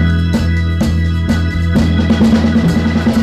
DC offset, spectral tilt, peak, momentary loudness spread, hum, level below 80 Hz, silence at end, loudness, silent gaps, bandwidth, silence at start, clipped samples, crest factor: 0.2%; -7 dB/octave; 0 dBFS; 4 LU; none; -22 dBFS; 0 s; -13 LUFS; none; 12.5 kHz; 0 s; under 0.1%; 10 dB